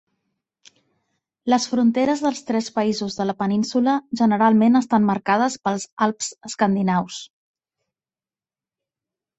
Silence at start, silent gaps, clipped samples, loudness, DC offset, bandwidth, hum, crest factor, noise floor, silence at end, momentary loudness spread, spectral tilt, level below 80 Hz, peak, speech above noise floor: 1.45 s; 5.92-5.97 s; under 0.1%; -20 LUFS; under 0.1%; 8.2 kHz; none; 18 dB; under -90 dBFS; 2.15 s; 9 LU; -5 dB/octave; -64 dBFS; -4 dBFS; over 70 dB